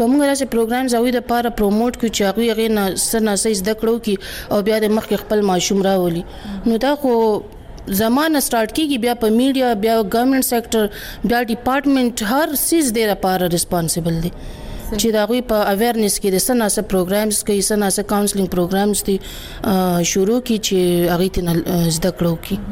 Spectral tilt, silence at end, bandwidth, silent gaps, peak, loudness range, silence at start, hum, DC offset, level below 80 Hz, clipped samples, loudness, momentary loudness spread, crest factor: -4.5 dB/octave; 0 s; 17 kHz; none; -6 dBFS; 1 LU; 0 s; none; 0.1%; -38 dBFS; under 0.1%; -17 LUFS; 6 LU; 10 dB